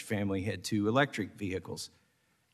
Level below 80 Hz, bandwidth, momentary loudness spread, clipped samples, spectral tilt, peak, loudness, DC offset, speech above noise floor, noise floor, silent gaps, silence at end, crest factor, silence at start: -68 dBFS; 13.5 kHz; 14 LU; under 0.1%; -5.5 dB/octave; -14 dBFS; -33 LUFS; under 0.1%; 40 dB; -73 dBFS; none; 0.65 s; 20 dB; 0 s